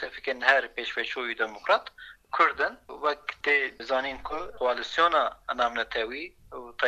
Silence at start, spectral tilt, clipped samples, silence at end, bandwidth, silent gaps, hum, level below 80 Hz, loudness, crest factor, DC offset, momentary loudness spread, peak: 0 s; -2.5 dB/octave; under 0.1%; 0 s; 13.5 kHz; none; none; -58 dBFS; -27 LUFS; 22 dB; under 0.1%; 12 LU; -6 dBFS